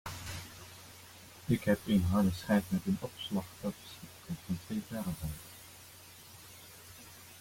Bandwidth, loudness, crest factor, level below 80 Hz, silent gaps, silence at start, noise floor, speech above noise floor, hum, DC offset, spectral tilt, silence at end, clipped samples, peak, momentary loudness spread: 16.5 kHz; -35 LUFS; 20 dB; -58 dBFS; none; 0.05 s; -54 dBFS; 21 dB; none; under 0.1%; -6 dB/octave; 0 s; under 0.1%; -16 dBFS; 21 LU